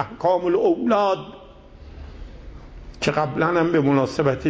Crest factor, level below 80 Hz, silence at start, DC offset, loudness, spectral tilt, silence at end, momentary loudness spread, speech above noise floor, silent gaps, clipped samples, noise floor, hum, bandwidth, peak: 16 dB; -44 dBFS; 0 s; under 0.1%; -20 LUFS; -6.5 dB/octave; 0 s; 22 LU; 23 dB; none; under 0.1%; -43 dBFS; none; 8 kHz; -6 dBFS